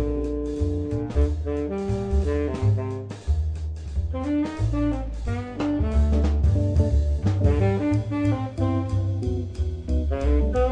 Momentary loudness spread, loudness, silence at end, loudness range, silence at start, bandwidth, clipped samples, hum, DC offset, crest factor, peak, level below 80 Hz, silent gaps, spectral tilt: 8 LU; -25 LUFS; 0 s; 4 LU; 0 s; 9 kHz; under 0.1%; none; under 0.1%; 16 dB; -8 dBFS; -26 dBFS; none; -9 dB/octave